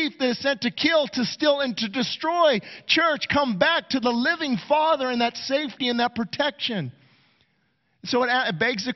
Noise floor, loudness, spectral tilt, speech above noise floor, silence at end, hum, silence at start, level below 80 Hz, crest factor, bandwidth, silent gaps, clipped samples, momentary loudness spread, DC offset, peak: -69 dBFS; -23 LUFS; -4.5 dB/octave; 46 dB; 0 s; none; 0 s; -62 dBFS; 18 dB; 6.4 kHz; none; under 0.1%; 6 LU; under 0.1%; -6 dBFS